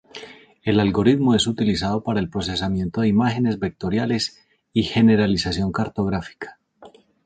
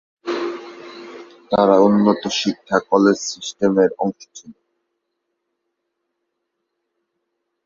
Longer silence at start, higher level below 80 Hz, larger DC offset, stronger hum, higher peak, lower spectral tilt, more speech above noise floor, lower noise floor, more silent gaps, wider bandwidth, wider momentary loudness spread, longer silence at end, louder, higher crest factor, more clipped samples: about the same, 0.15 s vs 0.25 s; first, -44 dBFS vs -62 dBFS; neither; neither; about the same, -4 dBFS vs -2 dBFS; about the same, -6 dB/octave vs -5 dB/octave; second, 28 dB vs 59 dB; second, -49 dBFS vs -76 dBFS; neither; first, 9.2 kHz vs 7.6 kHz; second, 11 LU vs 23 LU; second, 0.4 s vs 3.15 s; second, -21 LUFS vs -18 LUFS; about the same, 18 dB vs 20 dB; neither